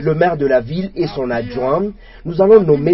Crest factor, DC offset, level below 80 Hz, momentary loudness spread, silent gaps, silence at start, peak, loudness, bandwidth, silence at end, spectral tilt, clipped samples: 14 dB; under 0.1%; -40 dBFS; 13 LU; none; 0 s; 0 dBFS; -15 LUFS; 5.8 kHz; 0 s; -11 dB/octave; under 0.1%